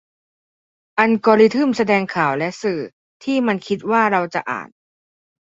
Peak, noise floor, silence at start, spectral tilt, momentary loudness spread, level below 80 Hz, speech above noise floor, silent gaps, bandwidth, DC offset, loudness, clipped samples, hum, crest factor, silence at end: -2 dBFS; under -90 dBFS; 0.95 s; -6 dB/octave; 14 LU; -64 dBFS; over 73 dB; 2.93-3.20 s; 7.8 kHz; under 0.1%; -18 LUFS; under 0.1%; none; 18 dB; 0.9 s